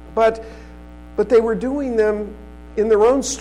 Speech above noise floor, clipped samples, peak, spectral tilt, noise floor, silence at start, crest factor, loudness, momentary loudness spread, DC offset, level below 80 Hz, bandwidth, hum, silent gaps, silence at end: 21 dB; under 0.1%; -6 dBFS; -4.5 dB/octave; -38 dBFS; 0 s; 12 dB; -18 LUFS; 18 LU; 0.3%; -40 dBFS; 11.5 kHz; 60 Hz at -40 dBFS; none; 0 s